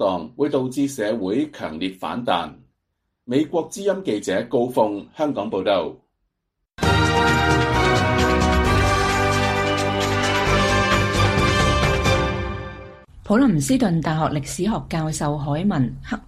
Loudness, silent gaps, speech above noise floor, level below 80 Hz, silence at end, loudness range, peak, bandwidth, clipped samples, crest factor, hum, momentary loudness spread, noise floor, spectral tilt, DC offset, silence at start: -20 LUFS; none; 55 dB; -32 dBFS; 0.05 s; 6 LU; -4 dBFS; 15 kHz; under 0.1%; 16 dB; none; 8 LU; -77 dBFS; -5 dB/octave; under 0.1%; 0 s